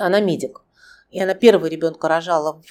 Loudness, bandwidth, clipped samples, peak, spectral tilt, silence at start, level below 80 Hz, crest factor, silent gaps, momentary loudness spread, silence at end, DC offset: -18 LUFS; 14.5 kHz; under 0.1%; 0 dBFS; -5.5 dB/octave; 0 s; -66 dBFS; 18 dB; none; 12 LU; 0.2 s; under 0.1%